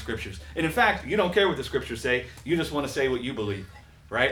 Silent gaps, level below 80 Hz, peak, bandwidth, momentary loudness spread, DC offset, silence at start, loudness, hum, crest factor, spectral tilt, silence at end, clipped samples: none; -46 dBFS; -8 dBFS; 19.5 kHz; 11 LU; under 0.1%; 0 s; -26 LUFS; none; 18 dB; -5 dB/octave; 0 s; under 0.1%